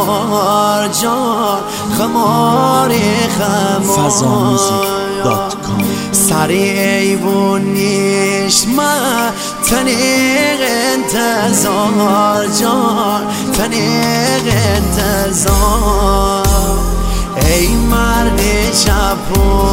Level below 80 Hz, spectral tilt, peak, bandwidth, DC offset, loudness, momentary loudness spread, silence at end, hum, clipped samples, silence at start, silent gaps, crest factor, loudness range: -22 dBFS; -4 dB/octave; 0 dBFS; 16.5 kHz; under 0.1%; -12 LUFS; 4 LU; 0 s; none; under 0.1%; 0 s; none; 12 dB; 1 LU